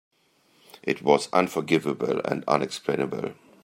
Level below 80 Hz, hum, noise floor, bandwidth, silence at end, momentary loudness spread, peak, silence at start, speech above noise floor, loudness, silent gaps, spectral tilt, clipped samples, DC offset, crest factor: -68 dBFS; none; -64 dBFS; 16 kHz; 0.3 s; 10 LU; -4 dBFS; 0.85 s; 39 dB; -25 LUFS; none; -5 dB/octave; under 0.1%; under 0.1%; 22 dB